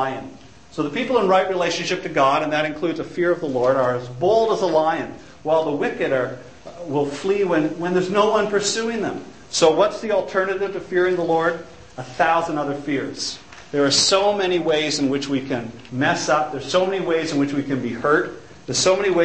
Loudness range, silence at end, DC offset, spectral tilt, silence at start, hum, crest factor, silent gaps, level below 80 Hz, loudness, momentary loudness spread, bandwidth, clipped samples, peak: 2 LU; 0 s; 0.4%; -4 dB/octave; 0 s; none; 20 dB; none; -56 dBFS; -20 LUFS; 11 LU; 8.8 kHz; under 0.1%; -2 dBFS